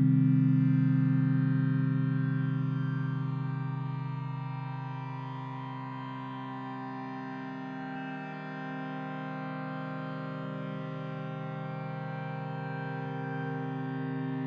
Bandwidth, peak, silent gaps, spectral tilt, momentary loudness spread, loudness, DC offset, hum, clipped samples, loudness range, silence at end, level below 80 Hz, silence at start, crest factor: 5 kHz; -16 dBFS; none; -10 dB/octave; 13 LU; -33 LUFS; under 0.1%; none; under 0.1%; 10 LU; 0 s; -80 dBFS; 0 s; 16 dB